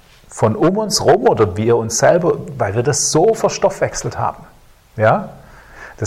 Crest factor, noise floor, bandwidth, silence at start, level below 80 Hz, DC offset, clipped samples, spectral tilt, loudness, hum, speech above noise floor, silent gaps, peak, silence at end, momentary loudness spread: 16 dB; -38 dBFS; 15.5 kHz; 0.3 s; -44 dBFS; under 0.1%; under 0.1%; -4.5 dB/octave; -15 LUFS; none; 23 dB; none; 0 dBFS; 0 s; 9 LU